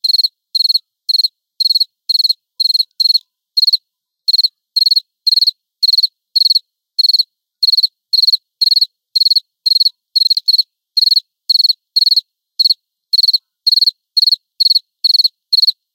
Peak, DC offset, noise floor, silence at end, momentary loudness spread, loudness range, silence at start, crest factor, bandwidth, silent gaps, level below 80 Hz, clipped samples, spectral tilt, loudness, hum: -2 dBFS; under 0.1%; -61 dBFS; 0.2 s; 4 LU; 2 LU; 0.05 s; 14 dB; 16.5 kHz; none; under -90 dBFS; under 0.1%; 11 dB/octave; -11 LUFS; none